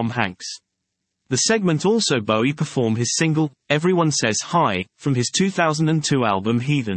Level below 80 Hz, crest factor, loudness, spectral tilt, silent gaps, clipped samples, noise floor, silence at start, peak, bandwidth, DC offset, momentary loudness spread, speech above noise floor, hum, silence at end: -64 dBFS; 18 dB; -20 LUFS; -4.5 dB/octave; none; under 0.1%; -78 dBFS; 0 s; -2 dBFS; 8.8 kHz; under 0.1%; 6 LU; 58 dB; none; 0 s